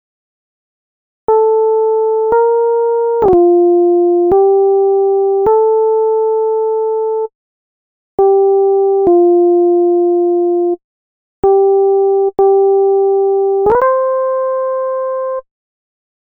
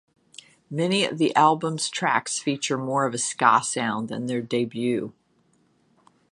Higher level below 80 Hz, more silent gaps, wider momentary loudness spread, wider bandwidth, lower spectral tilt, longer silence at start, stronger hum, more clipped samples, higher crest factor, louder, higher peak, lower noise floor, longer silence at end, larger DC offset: first, -48 dBFS vs -72 dBFS; first, 7.35-8.18 s, 10.84-11.43 s vs none; about the same, 7 LU vs 9 LU; second, 2.2 kHz vs 11.5 kHz; first, -11 dB/octave vs -3.5 dB/octave; first, 1.3 s vs 0.7 s; neither; neither; second, 10 dB vs 22 dB; first, -12 LUFS vs -24 LUFS; about the same, -2 dBFS vs -4 dBFS; first, under -90 dBFS vs -65 dBFS; second, 0.95 s vs 1.2 s; neither